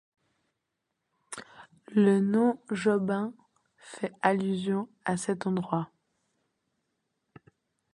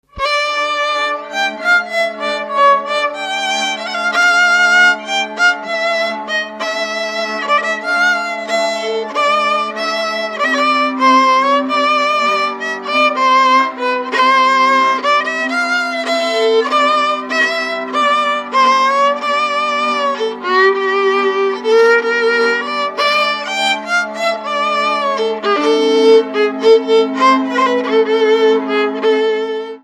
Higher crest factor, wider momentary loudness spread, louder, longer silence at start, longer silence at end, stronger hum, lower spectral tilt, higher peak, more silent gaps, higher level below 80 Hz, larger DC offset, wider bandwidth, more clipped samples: first, 22 dB vs 14 dB; first, 19 LU vs 8 LU; second, -28 LUFS vs -14 LUFS; first, 1.3 s vs 0.15 s; first, 2.1 s vs 0.05 s; neither; first, -6.5 dB/octave vs -2 dB/octave; second, -8 dBFS vs 0 dBFS; neither; second, -74 dBFS vs -56 dBFS; neither; second, 11 kHz vs 13 kHz; neither